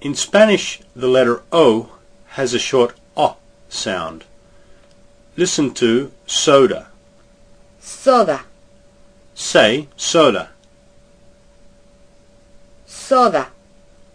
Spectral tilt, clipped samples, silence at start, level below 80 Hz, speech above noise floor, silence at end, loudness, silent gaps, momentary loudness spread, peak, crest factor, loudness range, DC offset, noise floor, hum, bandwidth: -3.5 dB/octave; under 0.1%; 0 s; -52 dBFS; 34 dB; 0.7 s; -16 LUFS; none; 16 LU; 0 dBFS; 18 dB; 5 LU; under 0.1%; -49 dBFS; none; 10.5 kHz